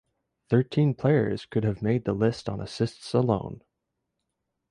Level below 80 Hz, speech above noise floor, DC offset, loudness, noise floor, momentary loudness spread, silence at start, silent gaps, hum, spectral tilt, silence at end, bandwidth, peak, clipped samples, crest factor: -54 dBFS; 56 dB; under 0.1%; -26 LUFS; -82 dBFS; 9 LU; 0.5 s; none; none; -8 dB/octave; 1.15 s; 11 kHz; -8 dBFS; under 0.1%; 18 dB